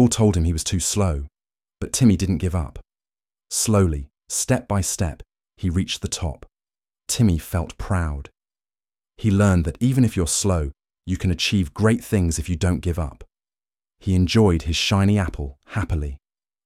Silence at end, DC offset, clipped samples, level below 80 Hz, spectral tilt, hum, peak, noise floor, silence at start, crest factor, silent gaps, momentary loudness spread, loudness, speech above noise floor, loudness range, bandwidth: 0.5 s; under 0.1%; under 0.1%; -34 dBFS; -5 dB/octave; none; -4 dBFS; under -90 dBFS; 0 s; 18 dB; none; 13 LU; -22 LUFS; over 70 dB; 4 LU; 15.5 kHz